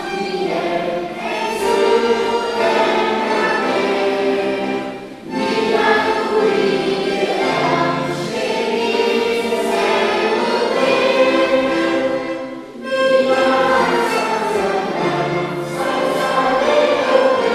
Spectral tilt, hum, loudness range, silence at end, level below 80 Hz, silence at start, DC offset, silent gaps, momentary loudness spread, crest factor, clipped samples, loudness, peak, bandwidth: -4.5 dB/octave; none; 2 LU; 0 s; -54 dBFS; 0 s; under 0.1%; none; 7 LU; 16 dB; under 0.1%; -17 LUFS; -2 dBFS; 14.5 kHz